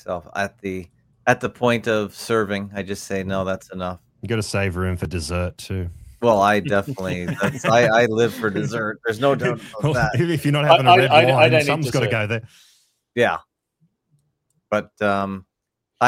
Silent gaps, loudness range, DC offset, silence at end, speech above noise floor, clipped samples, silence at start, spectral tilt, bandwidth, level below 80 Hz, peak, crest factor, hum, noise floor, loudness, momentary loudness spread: none; 9 LU; under 0.1%; 0 s; 58 dB; under 0.1%; 0.05 s; -5.5 dB/octave; 16.5 kHz; -48 dBFS; 0 dBFS; 20 dB; none; -78 dBFS; -20 LUFS; 15 LU